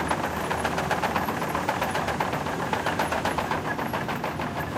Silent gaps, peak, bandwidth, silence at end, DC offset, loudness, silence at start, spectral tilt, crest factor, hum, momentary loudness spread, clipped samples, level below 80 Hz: none; -12 dBFS; 16 kHz; 0 s; under 0.1%; -27 LUFS; 0 s; -4.5 dB/octave; 16 dB; none; 3 LU; under 0.1%; -46 dBFS